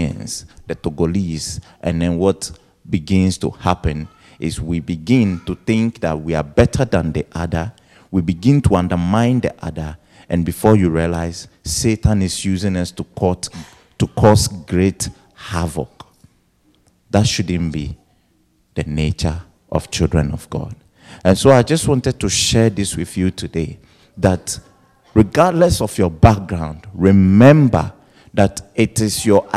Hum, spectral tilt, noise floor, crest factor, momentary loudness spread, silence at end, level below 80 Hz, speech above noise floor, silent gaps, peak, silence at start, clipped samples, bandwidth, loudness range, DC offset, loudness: none; -6 dB/octave; -59 dBFS; 16 dB; 14 LU; 0 s; -34 dBFS; 43 dB; none; 0 dBFS; 0 s; 0.1%; 14.5 kHz; 8 LU; under 0.1%; -17 LUFS